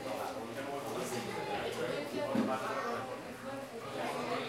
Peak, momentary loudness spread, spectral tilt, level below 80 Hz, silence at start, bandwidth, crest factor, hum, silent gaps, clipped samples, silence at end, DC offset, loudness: -20 dBFS; 9 LU; -4.5 dB/octave; -72 dBFS; 0 s; 16 kHz; 18 dB; none; none; under 0.1%; 0 s; under 0.1%; -38 LUFS